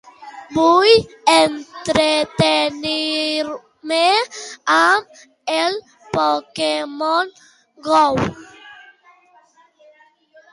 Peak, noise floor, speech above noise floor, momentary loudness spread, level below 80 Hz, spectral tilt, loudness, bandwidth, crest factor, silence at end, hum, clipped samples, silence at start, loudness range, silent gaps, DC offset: 0 dBFS; -53 dBFS; 36 dB; 14 LU; -52 dBFS; -3.5 dB/octave; -17 LUFS; 11.5 kHz; 18 dB; 1.8 s; none; under 0.1%; 0.2 s; 6 LU; none; under 0.1%